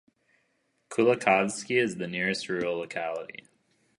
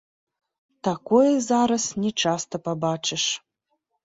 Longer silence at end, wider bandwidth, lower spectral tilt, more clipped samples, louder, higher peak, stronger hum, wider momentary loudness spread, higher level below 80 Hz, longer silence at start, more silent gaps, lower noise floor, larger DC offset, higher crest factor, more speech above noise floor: about the same, 0.75 s vs 0.65 s; first, 11.5 kHz vs 8 kHz; about the same, -4.5 dB/octave vs -4 dB/octave; neither; second, -27 LUFS vs -23 LUFS; about the same, -6 dBFS vs -6 dBFS; neither; about the same, 12 LU vs 10 LU; second, -72 dBFS vs -66 dBFS; about the same, 0.9 s vs 0.85 s; neither; about the same, -73 dBFS vs -75 dBFS; neither; first, 24 dB vs 18 dB; second, 46 dB vs 53 dB